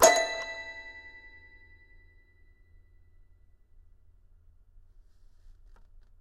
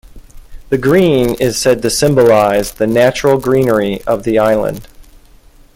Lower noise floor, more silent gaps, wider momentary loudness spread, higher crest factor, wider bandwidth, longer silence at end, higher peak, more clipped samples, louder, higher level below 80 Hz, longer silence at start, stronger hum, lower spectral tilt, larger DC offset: first, -59 dBFS vs -42 dBFS; neither; first, 28 LU vs 7 LU; first, 30 dB vs 12 dB; second, 14 kHz vs 17 kHz; first, 5.1 s vs 0.75 s; second, -4 dBFS vs 0 dBFS; neither; second, -30 LUFS vs -12 LUFS; second, -58 dBFS vs -36 dBFS; second, 0 s vs 0.15 s; neither; second, -0.5 dB/octave vs -5 dB/octave; neither